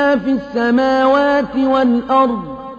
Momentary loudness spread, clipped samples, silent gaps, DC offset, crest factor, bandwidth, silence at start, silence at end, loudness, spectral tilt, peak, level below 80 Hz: 5 LU; under 0.1%; none; under 0.1%; 12 dB; 7.2 kHz; 0 s; 0 s; -15 LUFS; -6.5 dB/octave; -2 dBFS; -46 dBFS